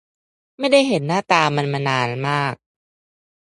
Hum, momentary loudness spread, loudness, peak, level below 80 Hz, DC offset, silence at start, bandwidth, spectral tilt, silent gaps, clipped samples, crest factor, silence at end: none; 9 LU; -19 LUFS; 0 dBFS; -64 dBFS; under 0.1%; 0.6 s; 11.5 kHz; -5 dB/octave; none; under 0.1%; 20 dB; 1.05 s